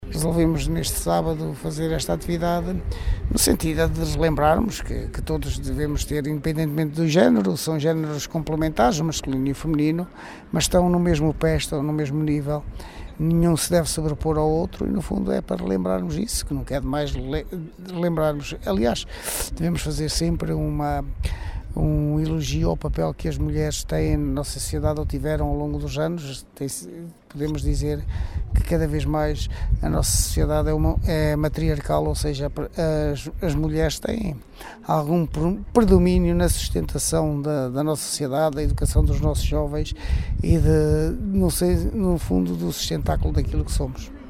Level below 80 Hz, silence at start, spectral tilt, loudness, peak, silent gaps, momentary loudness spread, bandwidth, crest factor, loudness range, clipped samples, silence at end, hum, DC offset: -30 dBFS; 0 s; -5.5 dB/octave; -23 LUFS; -2 dBFS; none; 9 LU; 16 kHz; 20 dB; 4 LU; under 0.1%; 0 s; none; under 0.1%